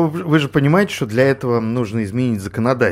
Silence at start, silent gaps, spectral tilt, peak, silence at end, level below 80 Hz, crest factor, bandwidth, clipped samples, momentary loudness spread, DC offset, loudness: 0 s; none; -7 dB/octave; -2 dBFS; 0 s; -50 dBFS; 16 dB; 15.5 kHz; under 0.1%; 6 LU; under 0.1%; -17 LUFS